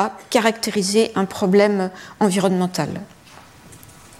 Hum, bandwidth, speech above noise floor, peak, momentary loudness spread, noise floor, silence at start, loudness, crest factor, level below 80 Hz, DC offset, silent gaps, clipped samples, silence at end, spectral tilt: none; 15.5 kHz; 26 dB; -4 dBFS; 10 LU; -45 dBFS; 0 s; -19 LUFS; 16 dB; -60 dBFS; under 0.1%; none; under 0.1%; 0.4 s; -5 dB/octave